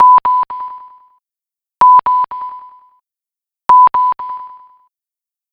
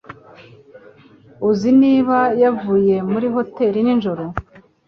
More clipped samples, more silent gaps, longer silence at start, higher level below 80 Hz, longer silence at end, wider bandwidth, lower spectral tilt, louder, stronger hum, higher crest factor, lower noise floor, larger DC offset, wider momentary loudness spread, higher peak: neither; neither; about the same, 0 s vs 0.1 s; second, -56 dBFS vs -48 dBFS; first, 1.05 s vs 0.45 s; second, 5.2 kHz vs 6.6 kHz; second, -4.5 dB/octave vs -8 dB/octave; first, -11 LUFS vs -17 LUFS; neither; about the same, 12 dB vs 14 dB; first, -88 dBFS vs -47 dBFS; neither; first, 19 LU vs 11 LU; about the same, -2 dBFS vs -4 dBFS